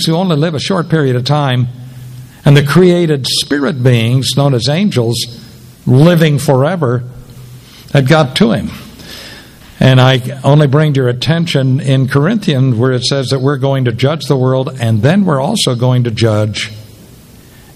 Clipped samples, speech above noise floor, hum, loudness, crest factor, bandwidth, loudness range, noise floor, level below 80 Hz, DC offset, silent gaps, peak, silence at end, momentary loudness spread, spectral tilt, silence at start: 0.4%; 27 dB; none; -11 LUFS; 12 dB; 14 kHz; 2 LU; -38 dBFS; -44 dBFS; under 0.1%; none; 0 dBFS; 0.9 s; 12 LU; -6 dB/octave; 0 s